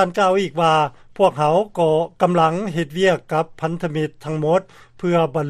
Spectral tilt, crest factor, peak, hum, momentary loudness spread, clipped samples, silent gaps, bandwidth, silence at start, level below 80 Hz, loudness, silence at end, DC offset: -6.5 dB/octave; 16 dB; -2 dBFS; none; 8 LU; under 0.1%; none; 13 kHz; 0 s; -54 dBFS; -19 LUFS; 0 s; under 0.1%